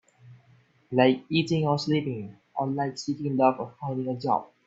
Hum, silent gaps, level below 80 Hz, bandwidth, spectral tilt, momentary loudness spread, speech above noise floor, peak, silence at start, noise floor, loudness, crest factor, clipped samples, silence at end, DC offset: none; none; -68 dBFS; 7.8 kHz; -6.5 dB/octave; 11 LU; 34 dB; -6 dBFS; 0.25 s; -60 dBFS; -27 LUFS; 20 dB; under 0.1%; 0.2 s; under 0.1%